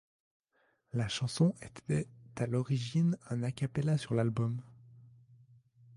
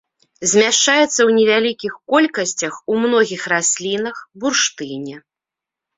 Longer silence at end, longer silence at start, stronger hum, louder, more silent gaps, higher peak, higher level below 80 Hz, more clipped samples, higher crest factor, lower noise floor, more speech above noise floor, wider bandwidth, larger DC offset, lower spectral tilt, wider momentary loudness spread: about the same, 0.9 s vs 0.8 s; first, 0.95 s vs 0.4 s; neither; second, -34 LUFS vs -16 LUFS; neither; second, -18 dBFS vs 0 dBFS; about the same, -64 dBFS vs -64 dBFS; neither; about the same, 18 dB vs 16 dB; second, -75 dBFS vs -86 dBFS; second, 42 dB vs 70 dB; first, 11.5 kHz vs 8 kHz; neither; first, -6.5 dB/octave vs -2 dB/octave; second, 9 LU vs 14 LU